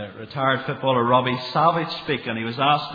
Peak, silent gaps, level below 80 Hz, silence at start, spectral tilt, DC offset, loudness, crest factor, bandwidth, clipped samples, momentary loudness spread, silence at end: -4 dBFS; none; -62 dBFS; 0 s; -7.5 dB/octave; under 0.1%; -22 LUFS; 18 dB; 5 kHz; under 0.1%; 7 LU; 0 s